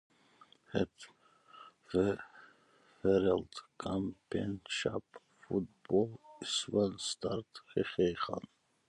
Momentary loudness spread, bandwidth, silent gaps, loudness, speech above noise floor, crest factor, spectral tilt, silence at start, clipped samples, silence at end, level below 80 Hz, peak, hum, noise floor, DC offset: 13 LU; 11.5 kHz; none; -36 LUFS; 32 dB; 20 dB; -5 dB/octave; 0.7 s; under 0.1%; 0.5 s; -62 dBFS; -16 dBFS; none; -67 dBFS; under 0.1%